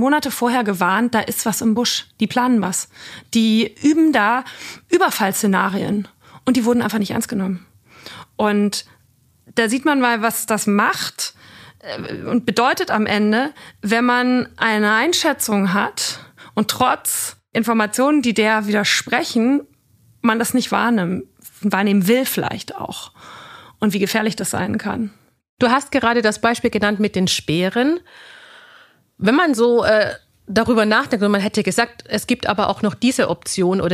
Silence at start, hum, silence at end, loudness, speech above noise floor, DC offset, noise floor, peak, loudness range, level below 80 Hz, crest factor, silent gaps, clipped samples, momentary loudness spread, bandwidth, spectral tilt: 0 s; none; 0 s; -18 LUFS; 39 dB; under 0.1%; -57 dBFS; 0 dBFS; 3 LU; -56 dBFS; 18 dB; 25.49-25.57 s; under 0.1%; 11 LU; 15.5 kHz; -4 dB/octave